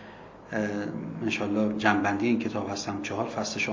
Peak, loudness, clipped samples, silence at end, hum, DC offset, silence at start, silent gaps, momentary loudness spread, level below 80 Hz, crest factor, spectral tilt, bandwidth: -6 dBFS; -28 LUFS; under 0.1%; 0 s; none; under 0.1%; 0 s; none; 10 LU; -60 dBFS; 22 dB; -5 dB/octave; 7.6 kHz